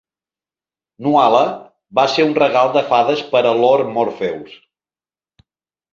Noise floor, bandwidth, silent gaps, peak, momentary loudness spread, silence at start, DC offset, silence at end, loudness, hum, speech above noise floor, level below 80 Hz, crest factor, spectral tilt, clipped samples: under -90 dBFS; 7.6 kHz; none; 0 dBFS; 11 LU; 1 s; under 0.1%; 1.5 s; -15 LUFS; none; over 75 dB; -64 dBFS; 16 dB; -5.5 dB/octave; under 0.1%